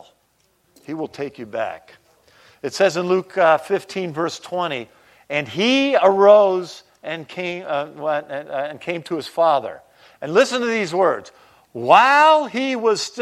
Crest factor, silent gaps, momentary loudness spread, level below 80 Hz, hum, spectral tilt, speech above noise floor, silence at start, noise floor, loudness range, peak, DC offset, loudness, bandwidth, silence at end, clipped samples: 20 dB; none; 17 LU; -70 dBFS; none; -4 dB/octave; 45 dB; 0.9 s; -63 dBFS; 7 LU; 0 dBFS; under 0.1%; -19 LUFS; 13.5 kHz; 0 s; under 0.1%